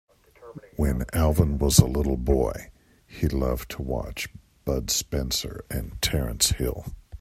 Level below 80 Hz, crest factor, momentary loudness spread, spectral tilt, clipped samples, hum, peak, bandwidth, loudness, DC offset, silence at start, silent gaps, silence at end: -32 dBFS; 26 dB; 16 LU; -4.5 dB/octave; under 0.1%; none; 0 dBFS; 16 kHz; -25 LUFS; under 0.1%; 0.4 s; none; 0.05 s